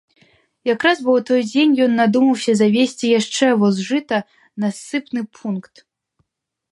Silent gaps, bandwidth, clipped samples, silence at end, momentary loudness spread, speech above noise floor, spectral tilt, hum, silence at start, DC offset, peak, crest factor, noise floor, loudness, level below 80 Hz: none; 11.5 kHz; under 0.1%; 1.1 s; 11 LU; 60 dB; -5 dB/octave; none; 0.65 s; under 0.1%; -2 dBFS; 16 dB; -77 dBFS; -18 LUFS; -68 dBFS